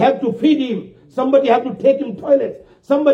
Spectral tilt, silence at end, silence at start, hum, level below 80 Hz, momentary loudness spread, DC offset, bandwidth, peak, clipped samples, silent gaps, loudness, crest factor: -7.5 dB/octave; 0 s; 0 s; none; -62 dBFS; 10 LU; under 0.1%; 6.8 kHz; -2 dBFS; under 0.1%; none; -17 LUFS; 14 dB